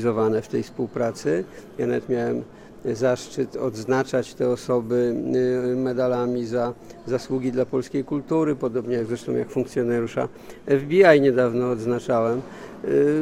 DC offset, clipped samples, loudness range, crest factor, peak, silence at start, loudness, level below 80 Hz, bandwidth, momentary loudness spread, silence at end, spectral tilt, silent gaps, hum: under 0.1%; under 0.1%; 5 LU; 20 dB; -4 dBFS; 0 s; -23 LUFS; -56 dBFS; 13.5 kHz; 9 LU; 0 s; -6.5 dB/octave; none; none